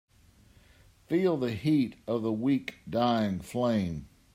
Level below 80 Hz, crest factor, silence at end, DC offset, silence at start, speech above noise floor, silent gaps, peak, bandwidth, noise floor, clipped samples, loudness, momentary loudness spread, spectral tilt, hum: -60 dBFS; 16 dB; 0.3 s; under 0.1%; 1.1 s; 32 dB; none; -14 dBFS; 16 kHz; -60 dBFS; under 0.1%; -29 LUFS; 5 LU; -7.5 dB/octave; none